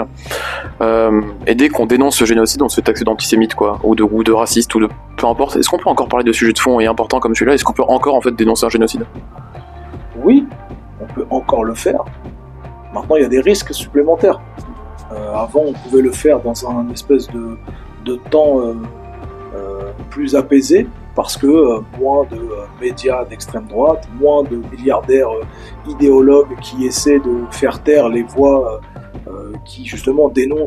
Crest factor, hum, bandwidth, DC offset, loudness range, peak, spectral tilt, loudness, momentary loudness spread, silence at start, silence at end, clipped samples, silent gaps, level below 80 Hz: 14 dB; none; 14 kHz; under 0.1%; 4 LU; 0 dBFS; -4.5 dB/octave; -14 LUFS; 19 LU; 0 s; 0 s; under 0.1%; none; -36 dBFS